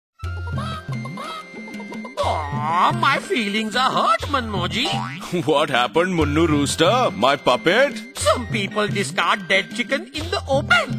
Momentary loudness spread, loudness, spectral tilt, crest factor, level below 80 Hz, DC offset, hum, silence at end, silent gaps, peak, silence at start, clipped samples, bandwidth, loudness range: 13 LU; -20 LUFS; -4.5 dB/octave; 20 dB; -40 dBFS; under 0.1%; none; 0 s; none; -2 dBFS; 0.2 s; under 0.1%; 16 kHz; 4 LU